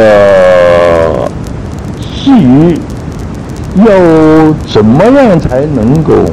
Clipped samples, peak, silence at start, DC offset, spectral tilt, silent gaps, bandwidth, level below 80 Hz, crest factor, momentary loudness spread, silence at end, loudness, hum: 5%; 0 dBFS; 0 s; under 0.1%; -7.5 dB/octave; none; 12 kHz; -24 dBFS; 6 dB; 15 LU; 0 s; -5 LUFS; none